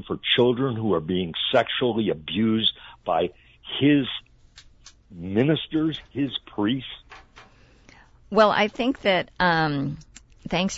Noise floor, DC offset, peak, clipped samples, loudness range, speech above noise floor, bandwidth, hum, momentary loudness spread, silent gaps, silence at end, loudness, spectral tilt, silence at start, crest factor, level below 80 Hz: -53 dBFS; under 0.1%; -4 dBFS; under 0.1%; 4 LU; 29 dB; 8 kHz; none; 13 LU; none; 0 s; -23 LUFS; -5.5 dB/octave; 0.05 s; 20 dB; -52 dBFS